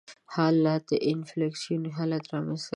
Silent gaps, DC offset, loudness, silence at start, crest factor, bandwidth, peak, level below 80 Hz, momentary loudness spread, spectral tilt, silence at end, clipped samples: none; under 0.1%; -28 LUFS; 0.1 s; 16 dB; 10.5 kHz; -12 dBFS; -72 dBFS; 8 LU; -6.5 dB/octave; 0.05 s; under 0.1%